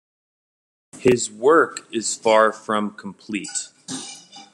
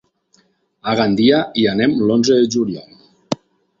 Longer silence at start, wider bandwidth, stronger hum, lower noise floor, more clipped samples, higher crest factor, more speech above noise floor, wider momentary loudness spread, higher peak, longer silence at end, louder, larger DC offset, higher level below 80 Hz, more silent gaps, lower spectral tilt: about the same, 0.95 s vs 0.85 s; first, 12 kHz vs 7.6 kHz; neither; second, -41 dBFS vs -59 dBFS; neither; about the same, 20 dB vs 16 dB; second, 21 dB vs 44 dB; first, 16 LU vs 13 LU; about the same, -2 dBFS vs -2 dBFS; second, 0.1 s vs 0.45 s; second, -20 LUFS vs -16 LUFS; neither; second, -60 dBFS vs -54 dBFS; neither; second, -3.5 dB/octave vs -5 dB/octave